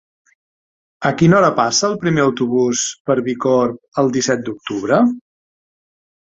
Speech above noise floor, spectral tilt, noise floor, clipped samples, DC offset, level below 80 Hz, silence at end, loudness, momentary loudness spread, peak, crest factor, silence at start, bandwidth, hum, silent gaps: over 74 dB; -5 dB/octave; under -90 dBFS; under 0.1%; under 0.1%; -54 dBFS; 1.15 s; -16 LUFS; 8 LU; -2 dBFS; 16 dB; 1 s; 8.4 kHz; none; 3.00-3.05 s, 3.88-3.92 s